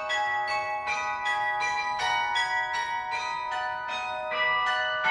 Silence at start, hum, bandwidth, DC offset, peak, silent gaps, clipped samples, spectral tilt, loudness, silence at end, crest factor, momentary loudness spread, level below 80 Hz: 0 s; none; 11 kHz; under 0.1%; -12 dBFS; none; under 0.1%; -0.5 dB/octave; -27 LUFS; 0 s; 16 dB; 6 LU; -62 dBFS